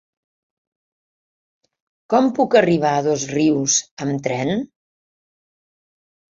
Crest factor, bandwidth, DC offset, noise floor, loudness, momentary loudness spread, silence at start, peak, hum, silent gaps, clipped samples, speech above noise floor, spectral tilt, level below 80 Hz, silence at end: 22 dB; 7.6 kHz; under 0.1%; under -90 dBFS; -18 LUFS; 9 LU; 2.1 s; 0 dBFS; none; 3.91-3.97 s; under 0.1%; over 72 dB; -4 dB/octave; -62 dBFS; 1.75 s